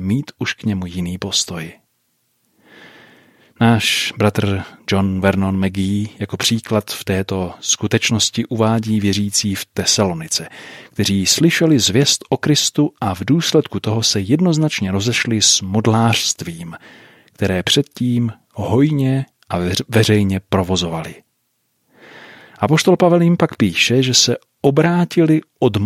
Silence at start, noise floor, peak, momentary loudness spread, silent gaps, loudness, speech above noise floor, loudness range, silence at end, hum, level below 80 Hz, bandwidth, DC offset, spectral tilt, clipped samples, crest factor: 0 s; -67 dBFS; 0 dBFS; 10 LU; none; -16 LUFS; 51 dB; 5 LU; 0 s; none; -52 dBFS; 16 kHz; under 0.1%; -4 dB/octave; under 0.1%; 18 dB